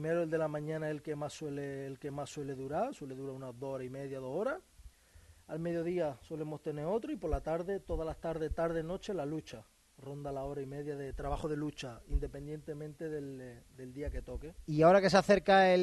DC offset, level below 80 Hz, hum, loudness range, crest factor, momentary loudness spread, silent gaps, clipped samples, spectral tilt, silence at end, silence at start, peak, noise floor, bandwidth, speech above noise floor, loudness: under 0.1%; -48 dBFS; none; 8 LU; 24 dB; 18 LU; none; under 0.1%; -6 dB/octave; 0 s; 0 s; -12 dBFS; -61 dBFS; 12 kHz; 26 dB; -35 LUFS